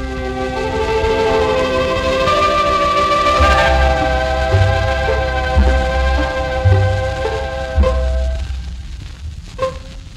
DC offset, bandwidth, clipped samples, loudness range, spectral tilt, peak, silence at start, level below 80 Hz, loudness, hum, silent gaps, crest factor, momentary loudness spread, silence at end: under 0.1%; 11 kHz; under 0.1%; 5 LU; -5.5 dB/octave; 0 dBFS; 0 s; -20 dBFS; -16 LUFS; none; none; 14 dB; 12 LU; 0 s